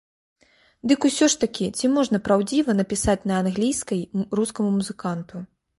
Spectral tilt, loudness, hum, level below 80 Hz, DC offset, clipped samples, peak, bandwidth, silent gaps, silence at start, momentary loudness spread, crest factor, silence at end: -4.5 dB/octave; -23 LUFS; none; -48 dBFS; under 0.1%; under 0.1%; -6 dBFS; 11.5 kHz; none; 0.85 s; 10 LU; 18 dB; 0.35 s